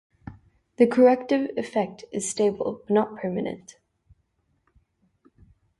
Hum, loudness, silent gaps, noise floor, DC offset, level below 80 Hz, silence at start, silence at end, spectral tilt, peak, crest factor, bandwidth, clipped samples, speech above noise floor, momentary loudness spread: none; -24 LUFS; none; -71 dBFS; under 0.1%; -62 dBFS; 0.25 s; 2.2 s; -5.5 dB/octave; -6 dBFS; 20 dB; 11.5 kHz; under 0.1%; 47 dB; 20 LU